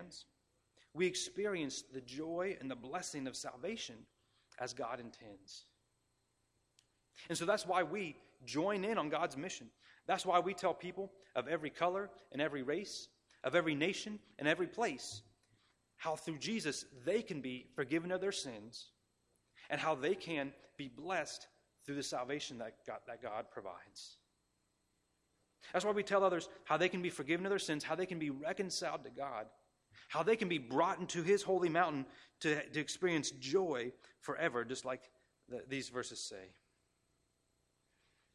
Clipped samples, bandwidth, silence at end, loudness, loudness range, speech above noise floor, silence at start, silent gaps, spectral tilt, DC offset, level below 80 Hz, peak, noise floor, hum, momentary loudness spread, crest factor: under 0.1%; 14.5 kHz; 1.85 s; -39 LUFS; 9 LU; 42 dB; 0 s; none; -4 dB/octave; under 0.1%; -78 dBFS; -18 dBFS; -81 dBFS; none; 16 LU; 22 dB